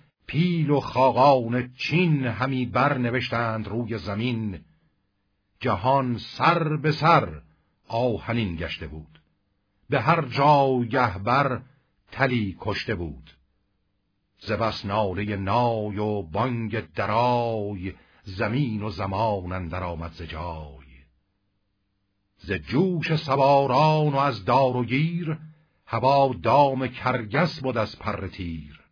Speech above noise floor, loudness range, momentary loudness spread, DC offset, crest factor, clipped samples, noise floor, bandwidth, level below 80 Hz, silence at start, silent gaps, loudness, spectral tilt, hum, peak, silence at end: 50 dB; 7 LU; 14 LU; under 0.1%; 20 dB; under 0.1%; -74 dBFS; 5.4 kHz; -50 dBFS; 0.3 s; none; -24 LUFS; -8 dB/octave; none; -4 dBFS; 0.15 s